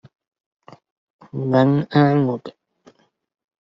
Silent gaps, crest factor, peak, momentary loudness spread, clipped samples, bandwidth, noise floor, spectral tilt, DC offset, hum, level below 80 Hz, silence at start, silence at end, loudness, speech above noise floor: none; 18 dB; -4 dBFS; 16 LU; under 0.1%; 6 kHz; -54 dBFS; -7 dB/octave; under 0.1%; none; -62 dBFS; 1.35 s; 1.2 s; -18 LUFS; 37 dB